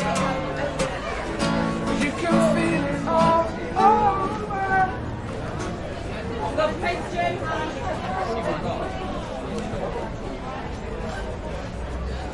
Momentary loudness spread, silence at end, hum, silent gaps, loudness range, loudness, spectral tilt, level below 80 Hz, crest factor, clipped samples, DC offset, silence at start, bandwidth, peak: 12 LU; 0 s; none; none; 8 LU; -25 LUFS; -5.5 dB/octave; -38 dBFS; 20 dB; under 0.1%; under 0.1%; 0 s; 11.5 kHz; -4 dBFS